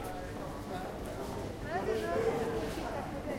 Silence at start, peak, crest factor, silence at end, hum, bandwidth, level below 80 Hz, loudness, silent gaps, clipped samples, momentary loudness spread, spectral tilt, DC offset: 0 s; -20 dBFS; 16 dB; 0 s; none; 16 kHz; -50 dBFS; -37 LUFS; none; under 0.1%; 8 LU; -6 dB/octave; under 0.1%